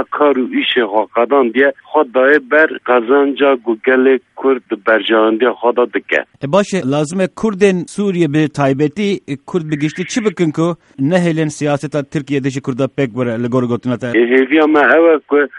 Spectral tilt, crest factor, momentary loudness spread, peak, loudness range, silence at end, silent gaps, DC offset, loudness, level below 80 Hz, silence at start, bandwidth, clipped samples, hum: -6 dB/octave; 14 dB; 8 LU; 0 dBFS; 4 LU; 0 s; none; under 0.1%; -14 LUFS; -56 dBFS; 0 s; 11 kHz; under 0.1%; none